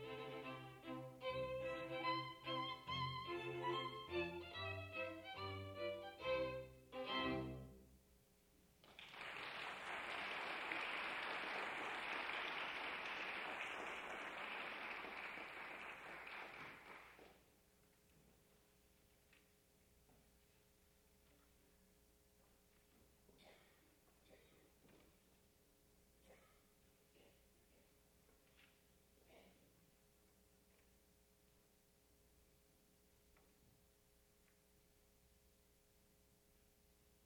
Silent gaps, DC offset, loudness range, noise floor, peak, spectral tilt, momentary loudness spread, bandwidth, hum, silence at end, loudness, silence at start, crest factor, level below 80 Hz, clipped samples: none; under 0.1%; 9 LU; -75 dBFS; -30 dBFS; -4.5 dB/octave; 11 LU; over 20 kHz; none; 0.3 s; -47 LUFS; 0 s; 22 dB; -76 dBFS; under 0.1%